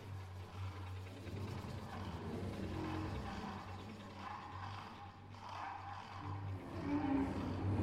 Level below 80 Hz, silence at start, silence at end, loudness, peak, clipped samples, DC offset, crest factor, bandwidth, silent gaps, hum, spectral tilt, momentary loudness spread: -58 dBFS; 0 s; 0 s; -45 LUFS; -26 dBFS; under 0.1%; under 0.1%; 18 dB; 13 kHz; none; none; -7 dB/octave; 11 LU